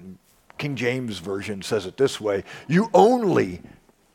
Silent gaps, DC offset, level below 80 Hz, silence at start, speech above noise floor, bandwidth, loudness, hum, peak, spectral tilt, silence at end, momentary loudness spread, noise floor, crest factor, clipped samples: none; under 0.1%; -60 dBFS; 0 s; 26 dB; 16 kHz; -23 LUFS; none; -2 dBFS; -6 dB/octave; 0.55 s; 13 LU; -48 dBFS; 20 dB; under 0.1%